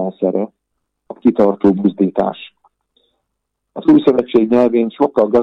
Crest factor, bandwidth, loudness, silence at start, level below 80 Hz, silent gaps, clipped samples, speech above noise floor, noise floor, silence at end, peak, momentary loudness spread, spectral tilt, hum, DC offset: 14 dB; 5.6 kHz; -15 LUFS; 0 s; -56 dBFS; none; under 0.1%; 61 dB; -75 dBFS; 0 s; -2 dBFS; 10 LU; -9 dB/octave; none; under 0.1%